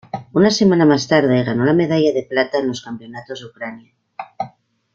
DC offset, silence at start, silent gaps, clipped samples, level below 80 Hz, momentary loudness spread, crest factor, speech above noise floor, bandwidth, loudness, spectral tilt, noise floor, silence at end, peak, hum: under 0.1%; 0.15 s; none; under 0.1%; -56 dBFS; 18 LU; 16 dB; 28 dB; 7.6 kHz; -16 LUFS; -6 dB/octave; -44 dBFS; 0.45 s; -2 dBFS; none